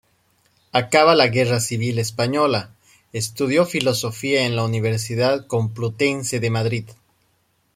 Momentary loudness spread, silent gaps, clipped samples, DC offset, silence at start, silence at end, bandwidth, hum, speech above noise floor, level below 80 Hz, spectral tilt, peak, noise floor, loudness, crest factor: 9 LU; none; under 0.1%; under 0.1%; 0.75 s; 0.8 s; 16 kHz; none; 45 dB; -58 dBFS; -4.5 dB/octave; -2 dBFS; -65 dBFS; -20 LUFS; 20 dB